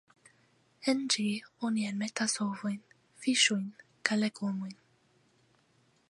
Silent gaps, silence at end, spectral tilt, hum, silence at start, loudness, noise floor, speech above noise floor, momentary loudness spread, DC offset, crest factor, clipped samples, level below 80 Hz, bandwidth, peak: none; 1.35 s; -3 dB/octave; none; 0.8 s; -31 LUFS; -69 dBFS; 38 dB; 12 LU; under 0.1%; 26 dB; under 0.1%; -84 dBFS; 11.5 kHz; -8 dBFS